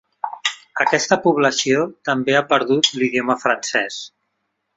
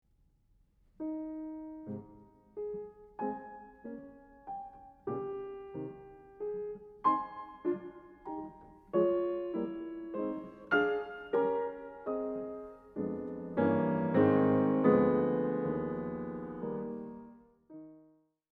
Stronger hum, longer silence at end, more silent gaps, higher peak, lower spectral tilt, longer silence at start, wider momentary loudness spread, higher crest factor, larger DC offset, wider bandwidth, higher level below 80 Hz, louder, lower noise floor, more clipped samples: neither; first, 0.7 s vs 0.55 s; neither; first, -2 dBFS vs -12 dBFS; second, -3 dB/octave vs -10 dB/octave; second, 0.25 s vs 1 s; second, 8 LU vs 21 LU; about the same, 18 dB vs 22 dB; neither; first, 8.4 kHz vs 4.6 kHz; about the same, -62 dBFS vs -66 dBFS; first, -18 LUFS vs -34 LUFS; first, -73 dBFS vs -69 dBFS; neither